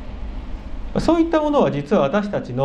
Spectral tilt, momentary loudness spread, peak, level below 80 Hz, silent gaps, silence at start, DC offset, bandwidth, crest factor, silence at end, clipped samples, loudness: -7.5 dB/octave; 17 LU; -2 dBFS; -32 dBFS; none; 0 s; under 0.1%; 9.8 kHz; 18 dB; 0 s; under 0.1%; -19 LUFS